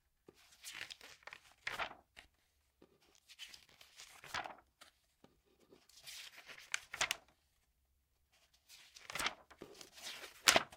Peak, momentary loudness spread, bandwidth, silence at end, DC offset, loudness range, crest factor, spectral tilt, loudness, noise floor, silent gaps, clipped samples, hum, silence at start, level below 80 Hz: -10 dBFS; 21 LU; 16.5 kHz; 0 s; under 0.1%; 8 LU; 36 dB; 0 dB/octave; -41 LUFS; -79 dBFS; none; under 0.1%; none; 0.65 s; -74 dBFS